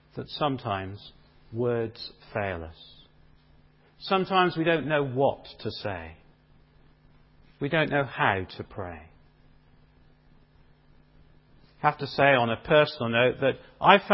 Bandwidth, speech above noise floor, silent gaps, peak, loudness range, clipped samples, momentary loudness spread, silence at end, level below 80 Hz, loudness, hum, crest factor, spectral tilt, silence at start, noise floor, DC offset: 5.8 kHz; 33 dB; none; -2 dBFS; 10 LU; under 0.1%; 17 LU; 0 s; -56 dBFS; -26 LUFS; none; 26 dB; -9.5 dB/octave; 0.15 s; -58 dBFS; under 0.1%